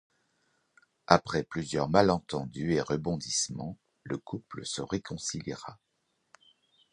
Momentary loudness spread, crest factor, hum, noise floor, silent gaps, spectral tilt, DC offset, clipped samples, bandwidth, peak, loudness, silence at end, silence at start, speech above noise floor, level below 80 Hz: 16 LU; 32 dB; none; -74 dBFS; none; -4.5 dB/octave; under 0.1%; under 0.1%; 11 kHz; 0 dBFS; -30 LUFS; 1.2 s; 1.1 s; 43 dB; -58 dBFS